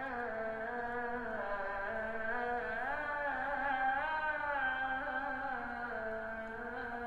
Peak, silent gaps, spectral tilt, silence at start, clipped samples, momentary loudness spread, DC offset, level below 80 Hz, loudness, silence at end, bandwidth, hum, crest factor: -24 dBFS; none; -6 dB/octave; 0 s; under 0.1%; 6 LU; under 0.1%; -58 dBFS; -38 LUFS; 0 s; 11.5 kHz; none; 14 dB